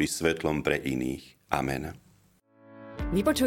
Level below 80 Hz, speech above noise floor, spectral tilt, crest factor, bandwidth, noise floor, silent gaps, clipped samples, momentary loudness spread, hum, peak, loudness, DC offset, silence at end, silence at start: -46 dBFS; 34 dB; -5 dB/octave; 24 dB; 17 kHz; -63 dBFS; none; under 0.1%; 14 LU; none; -4 dBFS; -30 LUFS; under 0.1%; 0 s; 0 s